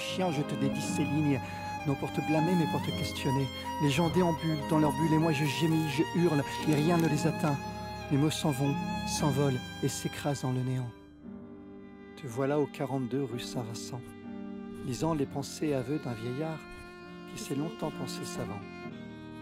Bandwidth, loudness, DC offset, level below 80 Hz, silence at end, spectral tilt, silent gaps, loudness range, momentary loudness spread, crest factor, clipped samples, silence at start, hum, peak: 16 kHz; -31 LUFS; under 0.1%; -56 dBFS; 0 s; -6 dB/octave; none; 7 LU; 16 LU; 18 dB; under 0.1%; 0 s; none; -14 dBFS